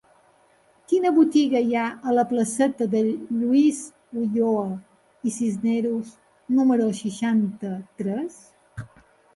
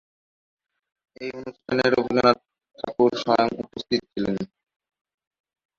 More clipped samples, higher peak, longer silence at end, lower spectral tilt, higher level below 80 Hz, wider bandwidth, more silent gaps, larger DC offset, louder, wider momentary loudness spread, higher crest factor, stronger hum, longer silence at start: neither; second, -8 dBFS vs -2 dBFS; second, 0.5 s vs 1.3 s; about the same, -6 dB/octave vs -6 dB/octave; second, -66 dBFS vs -58 dBFS; first, 11.5 kHz vs 7.4 kHz; neither; neither; about the same, -23 LUFS vs -23 LUFS; about the same, 15 LU vs 16 LU; second, 16 dB vs 24 dB; neither; second, 0.9 s vs 1.2 s